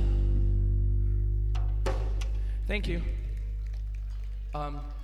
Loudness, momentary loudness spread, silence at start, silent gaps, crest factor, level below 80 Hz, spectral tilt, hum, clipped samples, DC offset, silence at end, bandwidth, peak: -32 LUFS; 9 LU; 0 s; none; 12 dB; -28 dBFS; -7 dB/octave; none; under 0.1%; under 0.1%; 0 s; 6.2 kHz; -16 dBFS